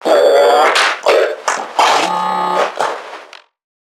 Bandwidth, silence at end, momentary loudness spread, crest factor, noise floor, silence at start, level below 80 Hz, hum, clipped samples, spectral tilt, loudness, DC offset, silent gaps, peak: 16.5 kHz; 0.6 s; 11 LU; 14 dB; -36 dBFS; 0 s; -70 dBFS; none; under 0.1%; -1.5 dB/octave; -13 LUFS; under 0.1%; none; 0 dBFS